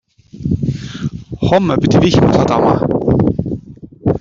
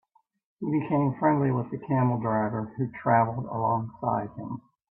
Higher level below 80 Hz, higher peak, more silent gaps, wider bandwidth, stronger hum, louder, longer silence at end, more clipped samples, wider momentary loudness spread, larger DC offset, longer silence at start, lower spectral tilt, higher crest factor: first, -34 dBFS vs -64 dBFS; first, 0 dBFS vs -10 dBFS; neither; first, 7.6 kHz vs 3.2 kHz; neither; first, -14 LUFS vs -27 LUFS; second, 0 s vs 0.3 s; neither; about the same, 14 LU vs 12 LU; neither; second, 0.35 s vs 0.6 s; second, -7.5 dB/octave vs -13 dB/octave; about the same, 14 dB vs 18 dB